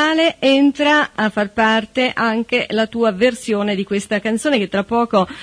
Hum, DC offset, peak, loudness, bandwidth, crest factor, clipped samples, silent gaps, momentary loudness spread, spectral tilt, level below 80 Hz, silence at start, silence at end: none; under 0.1%; -2 dBFS; -17 LUFS; 11 kHz; 14 dB; under 0.1%; none; 6 LU; -4.5 dB/octave; -52 dBFS; 0 s; 0 s